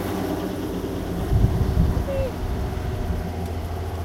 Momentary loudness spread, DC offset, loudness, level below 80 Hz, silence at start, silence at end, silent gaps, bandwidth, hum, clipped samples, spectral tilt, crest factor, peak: 7 LU; under 0.1%; -26 LUFS; -28 dBFS; 0 s; 0 s; none; 16 kHz; none; under 0.1%; -7.5 dB/octave; 18 dB; -4 dBFS